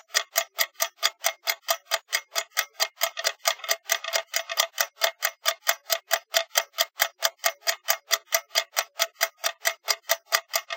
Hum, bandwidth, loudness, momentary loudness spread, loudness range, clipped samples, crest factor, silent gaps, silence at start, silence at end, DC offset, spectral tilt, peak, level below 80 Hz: none; 17.5 kHz; -26 LUFS; 3 LU; 1 LU; under 0.1%; 26 dB; none; 0.15 s; 0 s; under 0.1%; 6 dB/octave; -2 dBFS; -88 dBFS